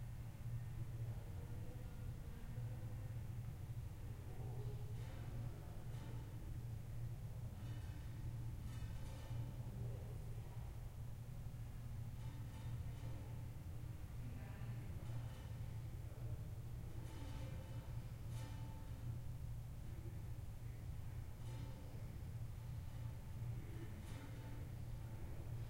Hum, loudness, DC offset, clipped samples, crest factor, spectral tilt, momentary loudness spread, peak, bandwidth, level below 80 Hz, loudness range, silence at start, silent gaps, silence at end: none; -51 LUFS; under 0.1%; under 0.1%; 12 dB; -7 dB/octave; 3 LU; -36 dBFS; 16 kHz; -54 dBFS; 1 LU; 0 s; none; 0 s